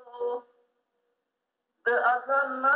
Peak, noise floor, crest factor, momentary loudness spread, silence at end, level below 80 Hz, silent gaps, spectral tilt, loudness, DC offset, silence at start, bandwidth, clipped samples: -12 dBFS; -83 dBFS; 16 dB; 9 LU; 0 s; -84 dBFS; none; 0.5 dB/octave; -27 LUFS; under 0.1%; 0.05 s; 4.5 kHz; under 0.1%